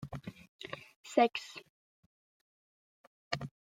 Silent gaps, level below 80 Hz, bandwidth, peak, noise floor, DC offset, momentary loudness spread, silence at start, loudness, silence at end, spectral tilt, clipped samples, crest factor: 0.48-0.59 s, 0.96-1.04 s, 1.70-3.31 s; -70 dBFS; 15 kHz; -12 dBFS; under -90 dBFS; under 0.1%; 20 LU; 0 s; -35 LUFS; 0.3 s; -5 dB/octave; under 0.1%; 26 dB